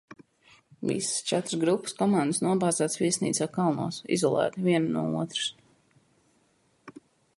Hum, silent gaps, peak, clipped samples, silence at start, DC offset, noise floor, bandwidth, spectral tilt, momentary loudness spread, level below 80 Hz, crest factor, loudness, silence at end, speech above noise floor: none; none; -12 dBFS; under 0.1%; 0.8 s; under 0.1%; -67 dBFS; 11.5 kHz; -4.5 dB/octave; 5 LU; -70 dBFS; 18 dB; -27 LUFS; 0.5 s; 41 dB